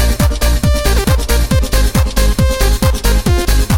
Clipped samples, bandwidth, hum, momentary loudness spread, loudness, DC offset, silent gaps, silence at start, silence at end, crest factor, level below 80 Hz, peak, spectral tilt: under 0.1%; 17 kHz; none; 1 LU; -14 LUFS; under 0.1%; none; 0 s; 0 s; 10 dB; -14 dBFS; 0 dBFS; -5 dB/octave